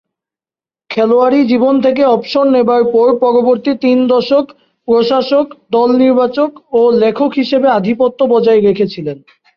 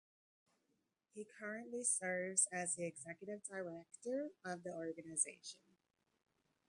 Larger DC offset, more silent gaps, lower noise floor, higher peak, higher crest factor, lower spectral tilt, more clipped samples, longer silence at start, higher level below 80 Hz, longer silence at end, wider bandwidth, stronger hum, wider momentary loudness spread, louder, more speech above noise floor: neither; neither; first, under -90 dBFS vs -85 dBFS; first, -2 dBFS vs -20 dBFS; second, 10 dB vs 24 dB; first, -7.5 dB/octave vs -2.5 dB/octave; neither; second, 0.9 s vs 1.15 s; first, -56 dBFS vs -90 dBFS; second, 0.4 s vs 1.1 s; second, 6.2 kHz vs 11.5 kHz; neither; second, 6 LU vs 18 LU; first, -11 LUFS vs -42 LUFS; first, over 79 dB vs 41 dB